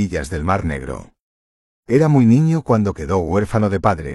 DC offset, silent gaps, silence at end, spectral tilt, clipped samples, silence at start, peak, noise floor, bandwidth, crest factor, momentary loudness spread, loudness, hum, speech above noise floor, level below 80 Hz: under 0.1%; 1.20-1.83 s; 0 s; -8 dB/octave; under 0.1%; 0 s; -2 dBFS; under -90 dBFS; 12 kHz; 14 dB; 12 LU; -17 LUFS; none; over 73 dB; -36 dBFS